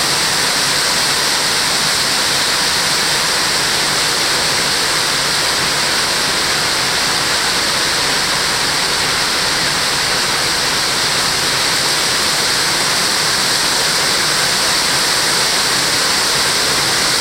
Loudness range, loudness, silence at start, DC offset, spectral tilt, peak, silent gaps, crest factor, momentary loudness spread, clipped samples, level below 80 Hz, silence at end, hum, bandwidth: 1 LU; -13 LUFS; 0 s; under 0.1%; -0.5 dB/octave; -2 dBFS; none; 14 dB; 1 LU; under 0.1%; -42 dBFS; 0 s; none; 16 kHz